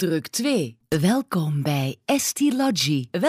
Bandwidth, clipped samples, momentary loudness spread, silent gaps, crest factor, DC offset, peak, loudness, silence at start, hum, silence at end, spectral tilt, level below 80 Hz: 15.5 kHz; under 0.1%; 4 LU; none; 14 dB; under 0.1%; -8 dBFS; -23 LUFS; 0 s; none; 0 s; -4.5 dB/octave; -58 dBFS